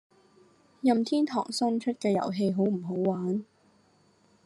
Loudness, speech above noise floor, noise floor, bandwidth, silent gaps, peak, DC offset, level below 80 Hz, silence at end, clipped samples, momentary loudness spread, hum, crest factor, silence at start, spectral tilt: -28 LUFS; 37 dB; -64 dBFS; 12 kHz; none; -12 dBFS; under 0.1%; -76 dBFS; 1 s; under 0.1%; 4 LU; none; 18 dB; 0.85 s; -6.5 dB/octave